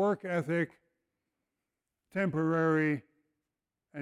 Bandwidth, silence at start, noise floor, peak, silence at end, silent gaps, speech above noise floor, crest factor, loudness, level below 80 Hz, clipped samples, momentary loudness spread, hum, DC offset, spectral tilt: 11.5 kHz; 0 s; -89 dBFS; -18 dBFS; 0 s; none; 59 dB; 16 dB; -31 LUFS; -76 dBFS; under 0.1%; 10 LU; none; under 0.1%; -8.5 dB/octave